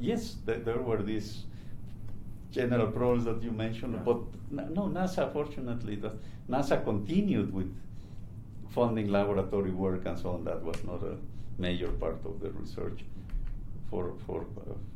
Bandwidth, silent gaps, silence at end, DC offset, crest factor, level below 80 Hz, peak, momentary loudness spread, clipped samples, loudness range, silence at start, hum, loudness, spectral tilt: 13.5 kHz; none; 0 s; under 0.1%; 18 dB; -44 dBFS; -14 dBFS; 17 LU; under 0.1%; 6 LU; 0 s; none; -33 LUFS; -7.5 dB/octave